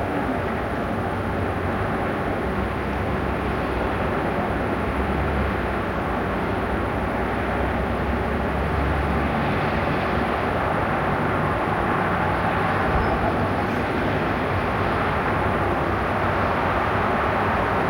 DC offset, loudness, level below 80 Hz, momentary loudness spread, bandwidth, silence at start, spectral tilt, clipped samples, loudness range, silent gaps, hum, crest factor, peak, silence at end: under 0.1%; -23 LUFS; -34 dBFS; 3 LU; 16.5 kHz; 0 s; -7.5 dB/octave; under 0.1%; 2 LU; none; none; 12 dB; -10 dBFS; 0 s